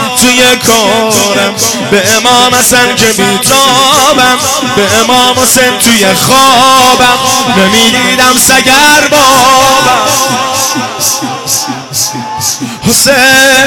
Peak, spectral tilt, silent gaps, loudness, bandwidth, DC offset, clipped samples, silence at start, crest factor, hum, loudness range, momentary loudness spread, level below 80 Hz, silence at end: 0 dBFS; -1.5 dB/octave; none; -5 LUFS; over 20 kHz; under 0.1%; 1%; 0 s; 6 dB; none; 4 LU; 8 LU; -38 dBFS; 0 s